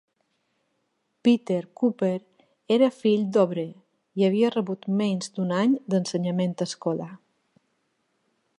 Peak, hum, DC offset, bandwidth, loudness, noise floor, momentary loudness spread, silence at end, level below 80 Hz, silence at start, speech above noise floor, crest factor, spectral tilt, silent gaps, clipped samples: -8 dBFS; none; under 0.1%; 11 kHz; -25 LUFS; -74 dBFS; 9 LU; 1.45 s; -76 dBFS; 1.25 s; 51 dB; 18 dB; -6.5 dB/octave; none; under 0.1%